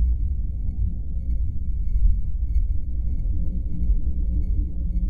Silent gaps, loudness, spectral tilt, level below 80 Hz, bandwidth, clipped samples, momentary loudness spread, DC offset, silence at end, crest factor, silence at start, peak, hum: none; -28 LUFS; -12 dB/octave; -22 dBFS; 0.8 kHz; under 0.1%; 4 LU; under 0.1%; 0 s; 14 dB; 0 s; -8 dBFS; none